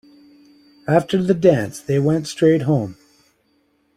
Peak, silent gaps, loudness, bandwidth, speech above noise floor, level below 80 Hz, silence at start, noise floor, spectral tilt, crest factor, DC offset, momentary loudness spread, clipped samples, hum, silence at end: -2 dBFS; none; -18 LUFS; 15 kHz; 46 dB; -54 dBFS; 0.9 s; -63 dBFS; -7 dB/octave; 18 dB; under 0.1%; 7 LU; under 0.1%; none; 1.05 s